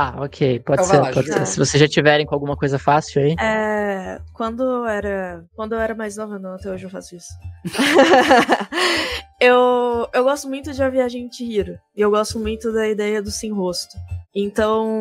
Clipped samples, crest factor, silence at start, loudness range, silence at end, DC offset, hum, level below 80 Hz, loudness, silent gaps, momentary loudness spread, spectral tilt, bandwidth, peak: under 0.1%; 18 dB; 0 s; 8 LU; 0 s; under 0.1%; none; -44 dBFS; -18 LUFS; none; 16 LU; -4.5 dB/octave; 16 kHz; 0 dBFS